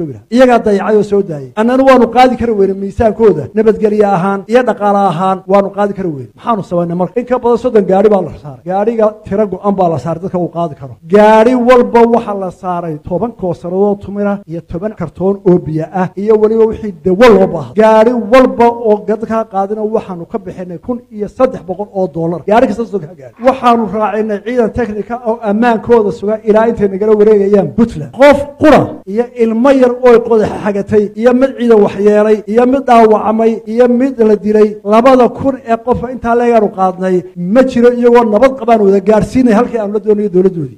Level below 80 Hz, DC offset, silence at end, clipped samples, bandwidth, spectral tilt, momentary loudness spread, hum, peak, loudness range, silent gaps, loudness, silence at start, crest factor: -38 dBFS; under 0.1%; 0.05 s; 1%; 11.5 kHz; -7.5 dB/octave; 11 LU; none; 0 dBFS; 5 LU; none; -10 LUFS; 0 s; 10 dB